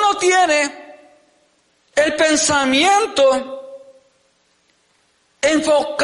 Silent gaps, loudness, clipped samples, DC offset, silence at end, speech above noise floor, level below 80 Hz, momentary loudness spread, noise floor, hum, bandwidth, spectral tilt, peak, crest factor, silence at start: none; -15 LUFS; under 0.1%; under 0.1%; 0 s; 45 dB; -56 dBFS; 9 LU; -61 dBFS; none; 11.5 kHz; -1.5 dB/octave; -4 dBFS; 14 dB; 0 s